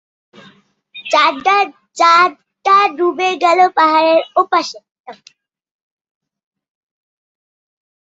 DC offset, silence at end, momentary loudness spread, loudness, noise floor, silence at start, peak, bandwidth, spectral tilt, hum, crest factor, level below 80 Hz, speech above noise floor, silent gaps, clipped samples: under 0.1%; 2.95 s; 7 LU; -13 LUFS; -49 dBFS; 0.95 s; 0 dBFS; 8 kHz; -2 dB/octave; none; 16 dB; -70 dBFS; 36 dB; 4.91-5.04 s; under 0.1%